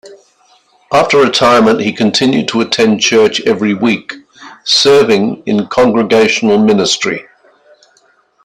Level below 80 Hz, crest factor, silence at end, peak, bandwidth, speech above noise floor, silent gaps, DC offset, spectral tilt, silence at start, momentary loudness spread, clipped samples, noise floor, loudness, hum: -50 dBFS; 12 dB; 1.2 s; 0 dBFS; 12.5 kHz; 42 dB; none; under 0.1%; -4 dB/octave; 0.05 s; 7 LU; under 0.1%; -52 dBFS; -10 LUFS; none